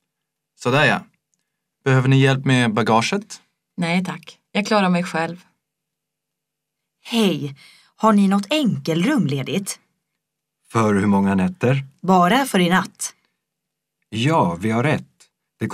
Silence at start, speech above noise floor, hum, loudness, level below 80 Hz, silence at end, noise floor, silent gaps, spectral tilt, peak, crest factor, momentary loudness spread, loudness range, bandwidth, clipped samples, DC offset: 0.6 s; 63 dB; none; -19 LUFS; -62 dBFS; 0 s; -81 dBFS; none; -5.5 dB/octave; -2 dBFS; 18 dB; 13 LU; 5 LU; 15 kHz; under 0.1%; under 0.1%